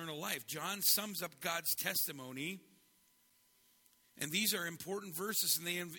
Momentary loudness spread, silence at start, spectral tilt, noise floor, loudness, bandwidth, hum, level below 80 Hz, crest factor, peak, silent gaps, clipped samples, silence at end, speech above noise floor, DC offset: 12 LU; 0 s; -1.5 dB/octave; -72 dBFS; -36 LUFS; 17.5 kHz; none; -82 dBFS; 22 dB; -18 dBFS; none; under 0.1%; 0 s; 34 dB; under 0.1%